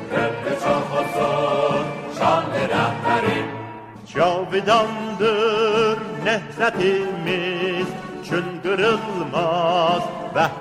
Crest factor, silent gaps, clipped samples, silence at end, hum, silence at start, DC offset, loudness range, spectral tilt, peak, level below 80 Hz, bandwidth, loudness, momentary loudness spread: 16 dB; none; under 0.1%; 0 s; none; 0 s; under 0.1%; 2 LU; -5.5 dB/octave; -4 dBFS; -56 dBFS; 16 kHz; -21 LUFS; 7 LU